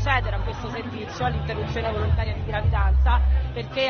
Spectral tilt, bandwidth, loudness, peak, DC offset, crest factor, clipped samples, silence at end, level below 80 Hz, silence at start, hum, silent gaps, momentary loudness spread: -4.5 dB/octave; 6.6 kHz; -25 LUFS; -6 dBFS; under 0.1%; 16 dB; under 0.1%; 0 s; -26 dBFS; 0 s; none; none; 10 LU